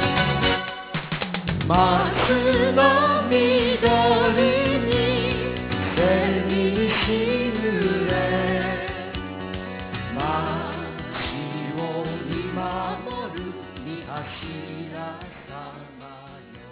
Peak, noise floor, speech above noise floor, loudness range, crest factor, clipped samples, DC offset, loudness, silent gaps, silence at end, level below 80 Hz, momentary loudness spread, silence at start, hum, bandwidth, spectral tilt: -4 dBFS; -43 dBFS; 25 dB; 12 LU; 20 dB; under 0.1%; under 0.1%; -22 LUFS; none; 0 s; -40 dBFS; 16 LU; 0 s; none; 4 kHz; -10 dB/octave